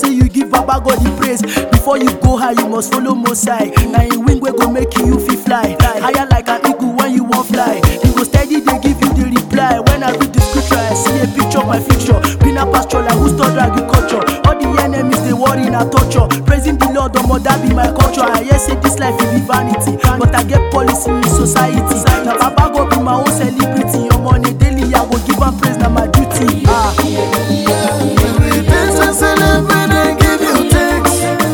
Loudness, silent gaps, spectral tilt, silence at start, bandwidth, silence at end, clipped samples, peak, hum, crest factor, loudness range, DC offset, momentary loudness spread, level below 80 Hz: -12 LUFS; none; -5.5 dB/octave; 0 s; over 20 kHz; 0 s; 0.4%; 0 dBFS; none; 12 dB; 1 LU; under 0.1%; 3 LU; -20 dBFS